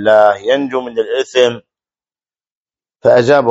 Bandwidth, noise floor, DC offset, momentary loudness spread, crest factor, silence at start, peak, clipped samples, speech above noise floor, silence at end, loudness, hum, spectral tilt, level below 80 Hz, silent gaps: 8 kHz; under -90 dBFS; under 0.1%; 9 LU; 14 dB; 0 s; 0 dBFS; 0.2%; over 79 dB; 0 s; -13 LUFS; none; -5 dB/octave; -58 dBFS; 2.51-2.65 s